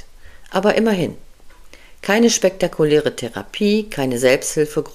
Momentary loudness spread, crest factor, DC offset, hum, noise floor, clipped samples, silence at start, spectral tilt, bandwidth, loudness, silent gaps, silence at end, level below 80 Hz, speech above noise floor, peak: 10 LU; 18 dB; 0.2%; none; -41 dBFS; under 0.1%; 0.1 s; -4 dB/octave; 15.5 kHz; -18 LUFS; none; 0 s; -44 dBFS; 24 dB; 0 dBFS